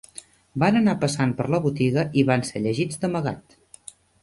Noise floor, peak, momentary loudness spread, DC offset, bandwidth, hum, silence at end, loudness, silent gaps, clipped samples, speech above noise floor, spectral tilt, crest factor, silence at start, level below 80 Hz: -47 dBFS; -6 dBFS; 22 LU; under 0.1%; 11.5 kHz; none; 0.8 s; -23 LUFS; none; under 0.1%; 25 dB; -6 dB/octave; 18 dB; 0.55 s; -56 dBFS